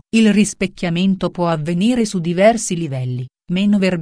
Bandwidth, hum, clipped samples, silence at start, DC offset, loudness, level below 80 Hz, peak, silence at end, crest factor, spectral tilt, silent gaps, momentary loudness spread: 10.5 kHz; none; under 0.1%; 0.15 s; under 0.1%; -17 LUFS; -48 dBFS; 0 dBFS; 0 s; 16 dB; -5.5 dB/octave; none; 9 LU